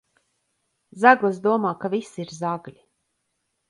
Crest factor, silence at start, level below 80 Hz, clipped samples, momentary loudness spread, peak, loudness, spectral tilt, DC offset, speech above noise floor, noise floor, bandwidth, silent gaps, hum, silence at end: 24 dB; 0.95 s; -72 dBFS; under 0.1%; 14 LU; -2 dBFS; -21 LUFS; -6 dB/octave; under 0.1%; 54 dB; -75 dBFS; 11.5 kHz; none; none; 1 s